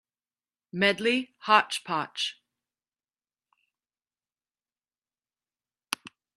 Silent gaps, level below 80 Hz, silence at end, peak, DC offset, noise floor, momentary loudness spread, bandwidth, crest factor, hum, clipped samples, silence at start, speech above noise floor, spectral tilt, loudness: none; -80 dBFS; 0.3 s; -4 dBFS; under 0.1%; under -90 dBFS; 14 LU; 12.5 kHz; 28 dB; none; under 0.1%; 0.75 s; over 64 dB; -3 dB/octave; -27 LUFS